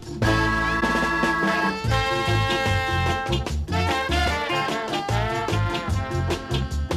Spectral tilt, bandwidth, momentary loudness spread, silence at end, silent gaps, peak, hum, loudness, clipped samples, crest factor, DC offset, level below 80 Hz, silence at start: -5 dB/octave; 15.5 kHz; 5 LU; 0 s; none; -8 dBFS; none; -23 LUFS; under 0.1%; 14 dB; under 0.1%; -32 dBFS; 0 s